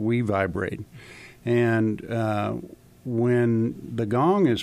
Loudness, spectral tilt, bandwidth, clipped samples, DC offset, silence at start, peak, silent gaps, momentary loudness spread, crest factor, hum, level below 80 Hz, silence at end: -24 LUFS; -8 dB/octave; 12.5 kHz; under 0.1%; under 0.1%; 0 s; -10 dBFS; none; 16 LU; 14 dB; none; -56 dBFS; 0 s